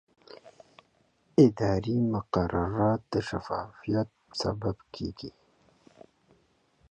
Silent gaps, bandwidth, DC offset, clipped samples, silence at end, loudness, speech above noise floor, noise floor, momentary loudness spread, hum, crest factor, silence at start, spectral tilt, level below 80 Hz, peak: none; 9 kHz; under 0.1%; under 0.1%; 1.6 s; -29 LUFS; 40 dB; -68 dBFS; 15 LU; none; 22 dB; 0.3 s; -7.5 dB/octave; -50 dBFS; -8 dBFS